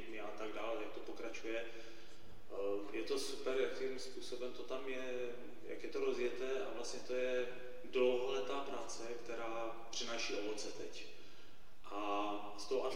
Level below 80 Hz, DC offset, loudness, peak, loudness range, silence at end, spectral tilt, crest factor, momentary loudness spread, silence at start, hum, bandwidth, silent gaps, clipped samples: -70 dBFS; 0.8%; -43 LUFS; -22 dBFS; 4 LU; 0 s; -3 dB/octave; 20 dB; 13 LU; 0 s; none; 16.5 kHz; none; under 0.1%